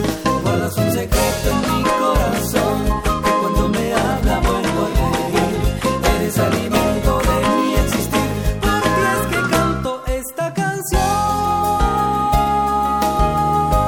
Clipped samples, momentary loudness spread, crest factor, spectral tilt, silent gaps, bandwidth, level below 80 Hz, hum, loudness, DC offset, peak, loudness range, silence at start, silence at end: under 0.1%; 3 LU; 16 dB; -5 dB/octave; none; 17.5 kHz; -24 dBFS; none; -18 LUFS; under 0.1%; -2 dBFS; 1 LU; 0 s; 0 s